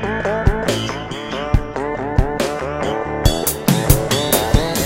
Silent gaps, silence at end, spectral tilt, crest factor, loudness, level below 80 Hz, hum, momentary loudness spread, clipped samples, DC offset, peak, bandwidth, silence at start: none; 0 s; -4.5 dB/octave; 18 dB; -19 LUFS; -24 dBFS; none; 8 LU; under 0.1%; under 0.1%; 0 dBFS; 17 kHz; 0 s